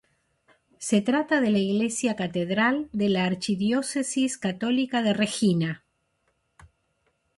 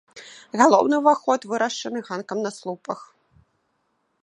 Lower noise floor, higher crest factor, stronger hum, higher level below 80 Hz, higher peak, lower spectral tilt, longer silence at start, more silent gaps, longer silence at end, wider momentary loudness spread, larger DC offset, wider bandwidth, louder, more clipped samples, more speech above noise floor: about the same, -72 dBFS vs -71 dBFS; about the same, 18 dB vs 22 dB; neither; first, -64 dBFS vs -72 dBFS; second, -8 dBFS vs 0 dBFS; about the same, -5 dB/octave vs -4 dB/octave; first, 0.8 s vs 0.15 s; neither; second, 0.75 s vs 1.2 s; second, 4 LU vs 17 LU; neither; about the same, 11.5 kHz vs 11 kHz; second, -25 LUFS vs -22 LUFS; neither; about the same, 48 dB vs 50 dB